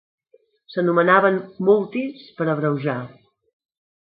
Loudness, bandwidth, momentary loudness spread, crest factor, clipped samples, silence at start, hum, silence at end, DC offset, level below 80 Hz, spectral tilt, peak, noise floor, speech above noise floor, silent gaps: -20 LUFS; 5 kHz; 15 LU; 20 dB; under 0.1%; 0.7 s; none; 1 s; under 0.1%; -68 dBFS; -11.5 dB/octave; -2 dBFS; -60 dBFS; 40 dB; none